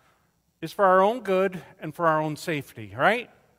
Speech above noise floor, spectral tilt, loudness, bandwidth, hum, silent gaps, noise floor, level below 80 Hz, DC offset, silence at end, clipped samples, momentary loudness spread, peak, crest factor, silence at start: 44 dB; -5.5 dB/octave; -24 LUFS; 16 kHz; none; none; -68 dBFS; -68 dBFS; under 0.1%; 0.35 s; under 0.1%; 18 LU; -6 dBFS; 20 dB; 0.6 s